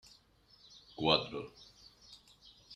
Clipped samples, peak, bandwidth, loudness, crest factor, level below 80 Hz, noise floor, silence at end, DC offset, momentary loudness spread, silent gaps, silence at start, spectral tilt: under 0.1%; -10 dBFS; 13.5 kHz; -33 LUFS; 30 dB; -68 dBFS; -66 dBFS; 0 s; under 0.1%; 26 LU; none; 1 s; -5 dB/octave